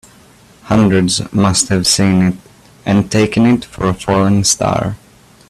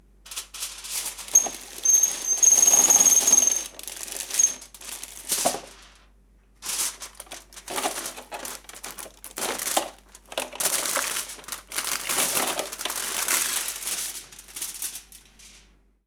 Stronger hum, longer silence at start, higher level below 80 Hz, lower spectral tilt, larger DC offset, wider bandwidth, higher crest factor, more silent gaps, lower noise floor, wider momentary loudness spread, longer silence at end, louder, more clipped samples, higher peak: neither; first, 0.65 s vs 0.25 s; first, -40 dBFS vs -58 dBFS; first, -4.5 dB/octave vs 1.5 dB/octave; neither; second, 14 kHz vs over 20 kHz; second, 14 dB vs 22 dB; neither; second, -44 dBFS vs -57 dBFS; second, 8 LU vs 22 LU; about the same, 0.55 s vs 0.6 s; first, -13 LUFS vs -21 LUFS; neither; first, 0 dBFS vs -4 dBFS